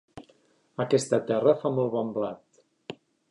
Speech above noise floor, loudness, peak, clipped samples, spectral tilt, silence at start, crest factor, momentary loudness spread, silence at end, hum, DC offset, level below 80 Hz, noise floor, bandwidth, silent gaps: 38 dB; -26 LUFS; -8 dBFS; under 0.1%; -6 dB/octave; 0.15 s; 20 dB; 22 LU; 0.35 s; none; under 0.1%; -72 dBFS; -64 dBFS; 11 kHz; none